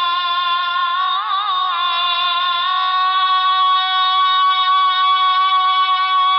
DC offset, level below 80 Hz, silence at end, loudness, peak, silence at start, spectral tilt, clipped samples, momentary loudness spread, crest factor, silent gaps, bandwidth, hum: under 0.1%; -90 dBFS; 0 s; -15 LUFS; -6 dBFS; 0 s; 0.5 dB/octave; under 0.1%; 4 LU; 8 dB; none; 5.6 kHz; none